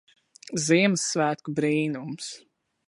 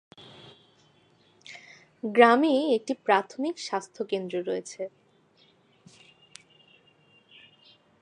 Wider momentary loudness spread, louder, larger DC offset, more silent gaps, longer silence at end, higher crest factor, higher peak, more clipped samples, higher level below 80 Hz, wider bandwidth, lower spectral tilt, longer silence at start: second, 15 LU vs 27 LU; about the same, -25 LUFS vs -26 LUFS; neither; neither; second, 0.5 s vs 3.15 s; second, 20 dB vs 28 dB; second, -8 dBFS vs -2 dBFS; neither; first, -72 dBFS vs -82 dBFS; first, 11.5 kHz vs 10 kHz; about the same, -4 dB/octave vs -4.5 dB/octave; second, 0.45 s vs 1.5 s